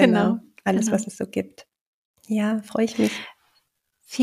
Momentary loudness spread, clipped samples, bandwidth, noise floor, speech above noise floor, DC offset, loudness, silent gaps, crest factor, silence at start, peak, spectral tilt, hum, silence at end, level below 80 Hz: 13 LU; under 0.1%; 15 kHz; -69 dBFS; 46 dB; under 0.1%; -24 LUFS; 1.81-2.14 s; 22 dB; 0 s; -2 dBFS; -5.5 dB/octave; none; 0 s; -66 dBFS